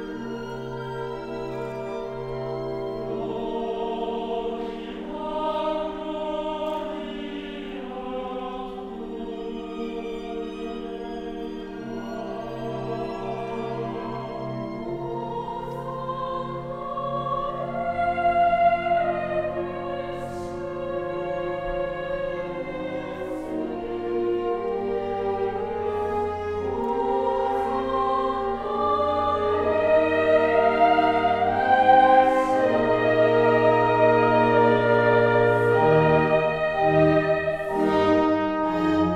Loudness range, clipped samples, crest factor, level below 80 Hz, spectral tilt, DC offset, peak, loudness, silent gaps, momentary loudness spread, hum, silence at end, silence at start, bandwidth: 13 LU; under 0.1%; 18 dB; -48 dBFS; -7.5 dB/octave; under 0.1%; -6 dBFS; -24 LUFS; none; 14 LU; none; 0 s; 0 s; 10.5 kHz